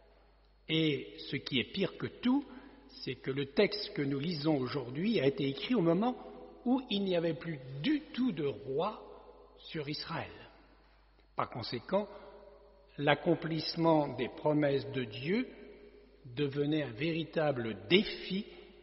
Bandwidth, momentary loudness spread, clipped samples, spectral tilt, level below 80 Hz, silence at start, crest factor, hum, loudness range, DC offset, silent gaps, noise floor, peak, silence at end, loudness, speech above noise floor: 5.8 kHz; 16 LU; under 0.1%; -4.5 dB/octave; -64 dBFS; 0.7 s; 24 dB; none; 8 LU; under 0.1%; none; -64 dBFS; -10 dBFS; 0.1 s; -34 LUFS; 31 dB